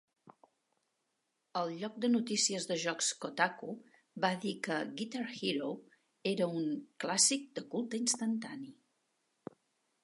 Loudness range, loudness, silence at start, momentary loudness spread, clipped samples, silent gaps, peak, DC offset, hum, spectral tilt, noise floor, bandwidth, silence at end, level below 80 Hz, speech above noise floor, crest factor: 3 LU; -34 LUFS; 0.25 s; 18 LU; under 0.1%; none; -14 dBFS; under 0.1%; none; -2.5 dB/octave; -83 dBFS; 11.5 kHz; 1.3 s; -90 dBFS; 48 dB; 22 dB